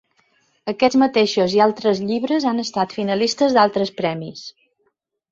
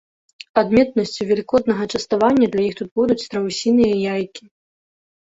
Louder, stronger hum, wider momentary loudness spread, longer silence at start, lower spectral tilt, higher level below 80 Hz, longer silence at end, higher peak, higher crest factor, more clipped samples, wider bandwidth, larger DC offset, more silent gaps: about the same, -19 LUFS vs -19 LUFS; neither; first, 14 LU vs 7 LU; about the same, 0.65 s vs 0.55 s; about the same, -5 dB/octave vs -5.5 dB/octave; second, -62 dBFS vs -52 dBFS; about the same, 0.8 s vs 0.9 s; about the same, -2 dBFS vs -2 dBFS; about the same, 18 dB vs 18 dB; neither; about the same, 7.8 kHz vs 8 kHz; neither; second, none vs 2.91-2.96 s